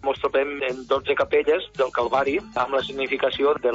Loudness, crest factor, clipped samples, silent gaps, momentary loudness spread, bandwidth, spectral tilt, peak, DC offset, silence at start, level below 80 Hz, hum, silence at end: -23 LUFS; 14 dB; under 0.1%; none; 4 LU; 7.8 kHz; -5 dB/octave; -8 dBFS; under 0.1%; 0 s; -54 dBFS; none; 0 s